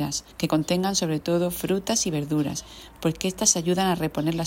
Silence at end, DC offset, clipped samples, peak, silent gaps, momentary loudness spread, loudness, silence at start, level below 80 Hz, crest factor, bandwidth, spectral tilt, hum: 0 s; under 0.1%; under 0.1%; -4 dBFS; none; 8 LU; -24 LUFS; 0 s; -50 dBFS; 20 dB; 16.5 kHz; -4 dB/octave; none